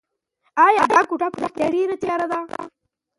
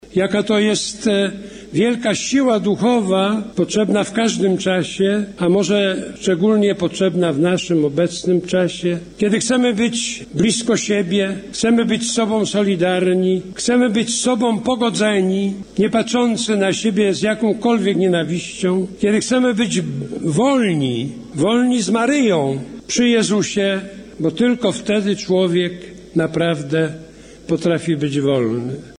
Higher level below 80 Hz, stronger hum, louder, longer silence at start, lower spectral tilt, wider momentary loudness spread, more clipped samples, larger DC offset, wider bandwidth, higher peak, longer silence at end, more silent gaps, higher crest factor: second, -62 dBFS vs -52 dBFS; neither; about the same, -19 LUFS vs -17 LUFS; first, 0.55 s vs 0.05 s; about the same, -4.5 dB/octave vs -5 dB/octave; first, 16 LU vs 6 LU; neither; neither; about the same, 11.5 kHz vs 10.5 kHz; first, -2 dBFS vs -6 dBFS; first, 0.5 s vs 0.05 s; neither; first, 18 dB vs 12 dB